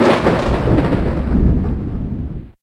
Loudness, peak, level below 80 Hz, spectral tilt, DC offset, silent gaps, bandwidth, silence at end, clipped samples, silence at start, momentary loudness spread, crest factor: -17 LUFS; 0 dBFS; -22 dBFS; -8 dB/octave; under 0.1%; none; 11 kHz; 0.1 s; under 0.1%; 0 s; 10 LU; 16 dB